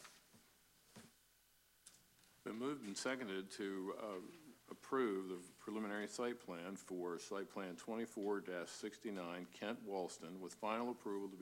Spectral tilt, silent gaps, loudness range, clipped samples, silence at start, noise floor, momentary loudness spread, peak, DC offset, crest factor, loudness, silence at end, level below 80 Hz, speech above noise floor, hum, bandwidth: -4.5 dB/octave; none; 3 LU; under 0.1%; 0 s; -74 dBFS; 19 LU; -28 dBFS; under 0.1%; 18 dB; -46 LUFS; 0 s; -88 dBFS; 28 dB; none; 16 kHz